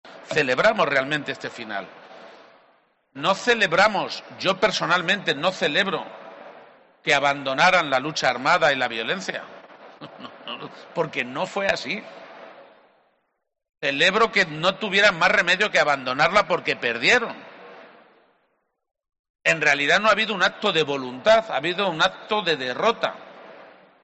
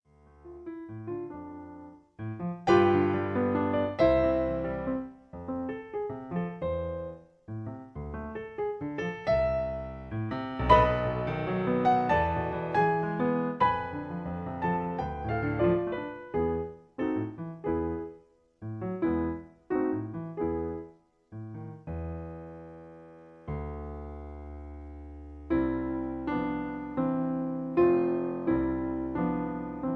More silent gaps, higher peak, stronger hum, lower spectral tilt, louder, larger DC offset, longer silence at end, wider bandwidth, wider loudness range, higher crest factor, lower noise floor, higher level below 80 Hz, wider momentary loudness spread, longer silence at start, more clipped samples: first, 19.19-19.24 s, 19.30-19.34 s vs none; about the same, -6 dBFS vs -6 dBFS; neither; second, -3 dB/octave vs -8.5 dB/octave; first, -21 LUFS vs -30 LUFS; neither; first, 0.35 s vs 0 s; first, 8.2 kHz vs 6.8 kHz; about the same, 9 LU vs 11 LU; second, 18 dB vs 24 dB; first, -75 dBFS vs -57 dBFS; second, -60 dBFS vs -46 dBFS; second, 15 LU vs 19 LU; second, 0.05 s vs 0.45 s; neither